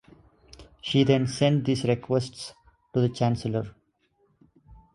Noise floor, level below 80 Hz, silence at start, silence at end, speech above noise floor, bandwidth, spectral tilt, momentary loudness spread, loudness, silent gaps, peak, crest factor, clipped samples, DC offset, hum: -69 dBFS; -56 dBFS; 0.6 s; 0.2 s; 44 dB; 11.5 kHz; -6.5 dB/octave; 16 LU; -25 LUFS; none; -6 dBFS; 20 dB; under 0.1%; under 0.1%; none